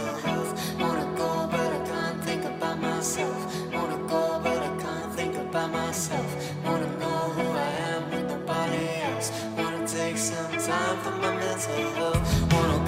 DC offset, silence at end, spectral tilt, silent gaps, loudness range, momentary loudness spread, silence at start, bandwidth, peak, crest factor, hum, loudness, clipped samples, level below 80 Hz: under 0.1%; 0 s; -4.5 dB/octave; none; 1 LU; 4 LU; 0 s; 16 kHz; -8 dBFS; 20 dB; none; -28 LUFS; under 0.1%; -44 dBFS